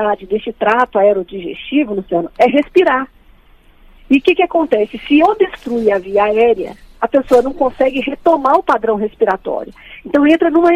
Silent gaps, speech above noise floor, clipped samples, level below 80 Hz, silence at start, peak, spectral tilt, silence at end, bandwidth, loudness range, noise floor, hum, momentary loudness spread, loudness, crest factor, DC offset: none; 32 dB; under 0.1%; -44 dBFS; 0 s; 0 dBFS; -6 dB/octave; 0 s; 12 kHz; 1 LU; -46 dBFS; none; 9 LU; -14 LUFS; 14 dB; under 0.1%